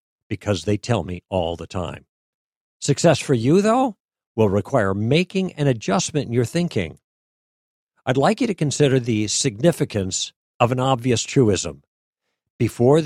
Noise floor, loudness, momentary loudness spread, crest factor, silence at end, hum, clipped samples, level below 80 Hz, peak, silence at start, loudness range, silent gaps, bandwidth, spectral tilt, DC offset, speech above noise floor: under -90 dBFS; -21 LUFS; 11 LU; 18 dB; 0 s; none; under 0.1%; -52 dBFS; -2 dBFS; 0.3 s; 3 LU; 2.09-2.80 s, 4.00-4.08 s, 4.26-4.35 s, 7.04-7.87 s, 10.36-10.60 s, 11.87-12.13 s, 12.50-12.59 s; 14 kHz; -5.5 dB/octave; under 0.1%; over 70 dB